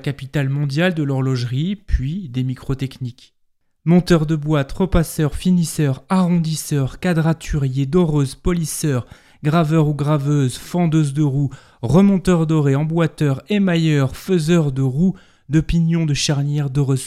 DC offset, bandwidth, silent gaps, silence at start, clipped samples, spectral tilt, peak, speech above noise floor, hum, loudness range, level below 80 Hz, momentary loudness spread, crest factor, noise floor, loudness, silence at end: under 0.1%; 14 kHz; none; 0 s; under 0.1%; -6.5 dB/octave; -2 dBFS; 40 dB; none; 4 LU; -34 dBFS; 8 LU; 16 dB; -58 dBFS; -18 LUFS; 0 s